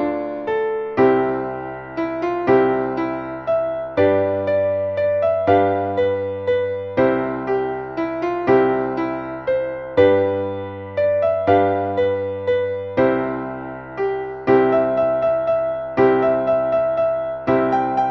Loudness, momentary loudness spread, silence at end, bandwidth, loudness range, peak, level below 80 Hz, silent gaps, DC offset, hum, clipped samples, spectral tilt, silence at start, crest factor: -19 LUFS; 9 LU; 0 s; 6 kHz; 2 LU; -2 dBFS; -52 dBFS; none; under 0.1%; none; under 0.1%; -8.5 dB/octave; 0 s; 16 dB